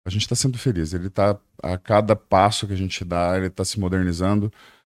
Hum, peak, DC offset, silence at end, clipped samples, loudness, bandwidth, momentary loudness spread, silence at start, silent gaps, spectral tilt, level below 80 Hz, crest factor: none; -2 dBFS; under 0.1%; 0.35 s; under 0.1%; -22 LUFS; 14 kHz; 8 LU; 0.05 s; none; -5.5 dB/octave; -44 dBFS; 18 dB